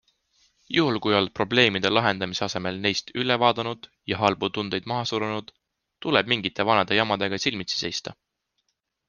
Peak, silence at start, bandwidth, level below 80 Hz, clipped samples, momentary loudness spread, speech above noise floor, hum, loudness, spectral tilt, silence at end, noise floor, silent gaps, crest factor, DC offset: -2 dBFS; 0.7 s; 10 kHz; -62 dBFS; under 0.1%; 10 LU; 52 dB; none; -24 LUFS; -4.5 dB/octave; 0.95 s; -76 dBFS; none; 24 dB; under 0.1%